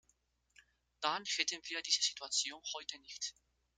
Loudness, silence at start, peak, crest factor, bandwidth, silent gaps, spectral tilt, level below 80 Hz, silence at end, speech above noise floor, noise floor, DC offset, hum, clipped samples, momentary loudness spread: -37 LUFS; 1 s; -16 dBFS; 24 dB; 13.5 kHz; none; 1.5 dB/octave; -80 dBFS; 0.45 s; 38 dB; -77 dBFS; under 0.1%; 60 Hz at -80 dBFS; under 0.1%; 11 LU